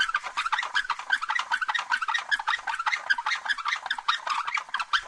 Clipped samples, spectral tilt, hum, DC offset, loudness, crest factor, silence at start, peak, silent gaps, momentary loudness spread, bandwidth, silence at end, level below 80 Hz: under 0.1%; 2.5 dB/octave; none; under 0.1%; -27 LUFS; 18 dB; 0 s; -10 dBFS; none; 2 LU; 12 kHz; 0 s; -66 dBFS